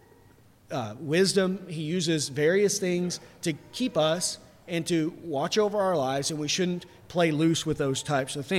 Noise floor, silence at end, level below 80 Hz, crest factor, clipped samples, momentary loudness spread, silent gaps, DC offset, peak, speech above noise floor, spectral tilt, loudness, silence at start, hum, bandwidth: -57 dBFS; 0 s; -62 dBFS; 16 dB; under 0.1%; 10 LU; none; under 0.1%; -12 dBFS; 30 dB; -4.5 dB/octave; -27 LUFS; 0.7 s; none; 16 kHz